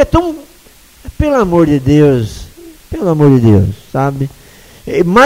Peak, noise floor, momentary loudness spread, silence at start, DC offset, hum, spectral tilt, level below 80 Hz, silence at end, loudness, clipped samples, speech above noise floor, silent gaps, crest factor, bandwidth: 0 dBFS; -42 dBFS; 15 LU; 0 s; under 0.1%; none; -7.5 dB/octave; -28 dBFS; 0 s; -12 LUFS; 0.3%; 32 dB; none; 12 dB; 16 kHz